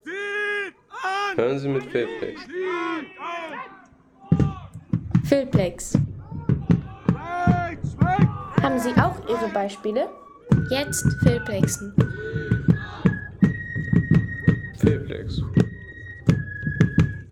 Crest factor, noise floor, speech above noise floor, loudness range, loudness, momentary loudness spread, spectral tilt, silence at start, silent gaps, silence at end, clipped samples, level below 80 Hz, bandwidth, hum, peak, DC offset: 20 dB; -51 dBFS; 29 dB; 5 LU; -24 LUFS; 10 LU; -6.5 dB/octave; 0.05 s; none; 0 s; under 0.1%; -42 dBFS; 16 kHz; none; -2 dBFS; under 0.1%